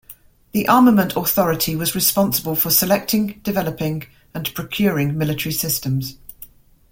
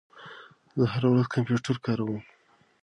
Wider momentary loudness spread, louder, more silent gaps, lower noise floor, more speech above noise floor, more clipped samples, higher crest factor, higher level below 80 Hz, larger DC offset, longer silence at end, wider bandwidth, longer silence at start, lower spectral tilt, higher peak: second, 12 LU vs 22 LU; first, -18 LUFS vs -27 LUFS; neither; about the same, -46 dBFS vs -49 dBFS; first, 27 dB vs 23 dB; neither; about the same, 18 dB vs 18 dB; first, -48 dBFS vs -64 dBFS; neither; second, 0.45 s vs 0.6 s; first, 17 kHz vs 9.4 kHz; about the same, 0.1 s vs 0.15 s; second, -4.5 dB/octave vs -7.5 dB/octave; first, 0 dBFS vs -10 dBFS